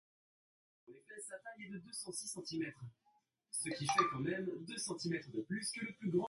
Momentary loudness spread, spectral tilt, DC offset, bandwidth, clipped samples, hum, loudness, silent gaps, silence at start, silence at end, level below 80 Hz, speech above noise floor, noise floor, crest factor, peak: 15 LU; -4 dB/octave; under 0.1%; 12 kHz; under 0.1%; none; -41 LUFS; none; 0.9 s; 0 s; -78 dBFS; 27 dB; -68 dBFS; 24 dB; -18 dBFS